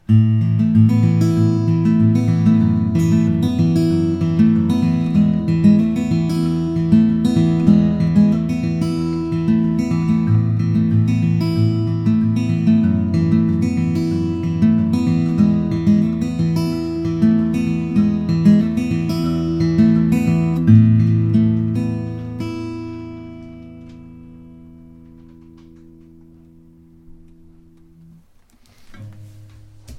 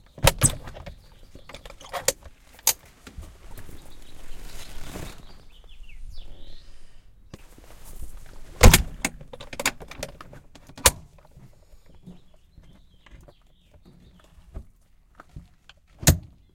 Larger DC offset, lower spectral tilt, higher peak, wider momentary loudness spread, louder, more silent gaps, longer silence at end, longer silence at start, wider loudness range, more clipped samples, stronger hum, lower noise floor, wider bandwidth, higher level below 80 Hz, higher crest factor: neither; first, -9 dB/octave vs -3 dB/octave; about the same, 0 dBFS vs 0 dBFS; second, 7 LU vs 28 LU; first, -16 LUFS vs -22 LUFS; neither; second, 0 s vs 0.35 s; about the same, 0.1 s vs 0.2 s; second, 3 LU vs 22 LU; neither; neither; second, -51 dBFS vs -56 dBFS; second, 11.5 kHz vs 16.5 kHz; second, -42 dBFS vs -34 dBFS; second, 16 dB vs 28 dB